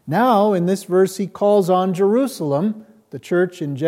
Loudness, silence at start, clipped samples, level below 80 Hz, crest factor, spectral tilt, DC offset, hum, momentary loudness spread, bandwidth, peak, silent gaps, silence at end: -18 LUFS; 0.05 s; under 0.1%; -72 dBFS; 14 dB; -6.5 dB/octave; under 0.1%; none; 9 LU; 16 kHz; -4 dBFS; none; 0 s